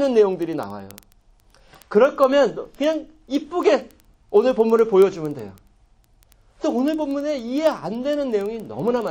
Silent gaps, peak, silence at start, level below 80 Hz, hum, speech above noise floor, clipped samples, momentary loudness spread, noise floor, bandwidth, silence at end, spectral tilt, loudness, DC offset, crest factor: none; -4 dBFS; 0 s; -56 dBFS; none; 36 dB; under 0.1%; 13 LU; -56 dBFS; 17 kHz; 0 s; -6 dB/octave; -21 LUFS; under 0.1%; 18 dB